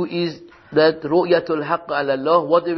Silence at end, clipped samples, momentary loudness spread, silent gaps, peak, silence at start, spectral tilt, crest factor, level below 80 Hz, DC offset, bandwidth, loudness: 0 s; under 0.1%; 7 LU; none; -4 dBFS; 0 s; -7.5 dB/octave; 16 dB; -60 dBFS; under 0.1%; 6 kHz; -19 LUFS